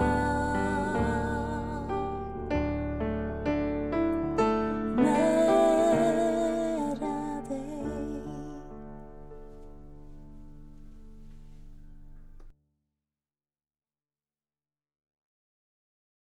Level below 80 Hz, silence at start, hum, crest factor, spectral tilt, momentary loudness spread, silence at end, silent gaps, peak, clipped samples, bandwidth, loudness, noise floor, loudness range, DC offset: -44 dBFS; 0 s; none; 18 dB; -6.5 dB/octave; 19 LU; 3.7 s; none; -12 dBFS; under 0.1%; 14.5 kHz; -28 LUFS; under -90 dBFS; 17 LU; under 0.1%